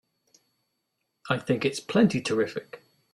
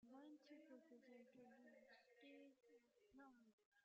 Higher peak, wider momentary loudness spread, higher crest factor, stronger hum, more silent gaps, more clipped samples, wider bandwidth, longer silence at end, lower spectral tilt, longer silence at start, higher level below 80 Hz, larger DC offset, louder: first, -8 dBFS vs -54 dBFS; first, 11 LU vs 4 LU; first, 22 dB vs 14 dB; neither; second, none vs 3.53-3.58 s, 3.65-3.72 s; neither; first, 12.5 kHz vs 7 kHz; first, 0.35 s vs 0 s; first, -5.5 dB/octave vs -3 dB/octave; first, 1.25 s vs 0 s; first, -66 dBFS vs under -90 dBFS; neither; first, -26 LUFS vs -68 LUFS